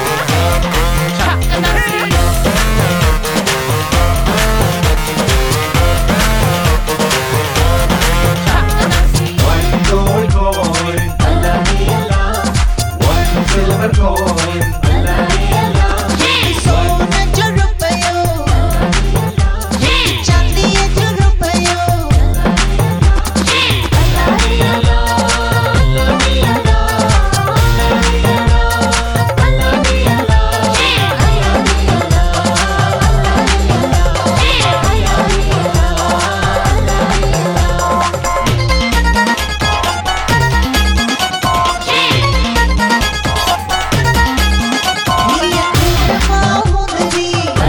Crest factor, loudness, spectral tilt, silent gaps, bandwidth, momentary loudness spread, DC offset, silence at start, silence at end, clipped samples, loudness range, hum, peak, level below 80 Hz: 12 dB; -12 LUFS; -4.5 dB/octave; none; 19.5 kHz; 3 LU; 0.9%; 0 s; 0 s; under 0.1%; 1 LU; none; 0 dBFS; -16 dBFS